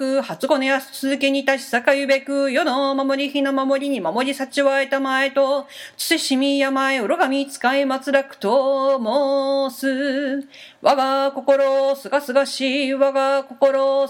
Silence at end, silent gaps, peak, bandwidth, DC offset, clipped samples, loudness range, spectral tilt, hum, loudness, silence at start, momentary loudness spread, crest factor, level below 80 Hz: 0 s; none; 0 dBFS; 17 kHz; under 0.1%; under 0.1%; 1 LU; -3 dB/octave; none; -19 LUFS; 0 s; 5 LU; 20 dB; -76 dBFS